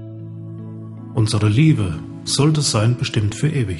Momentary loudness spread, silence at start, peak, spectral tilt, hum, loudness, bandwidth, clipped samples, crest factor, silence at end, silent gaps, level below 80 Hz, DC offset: 18 LU; 0 s; -4 dBFS; -5.5 dB/octave; none; -18 LUFS; 11.5 kHz; under 0.1%; 16 dB; 0 s; none; -46 dBFS; under 0.1%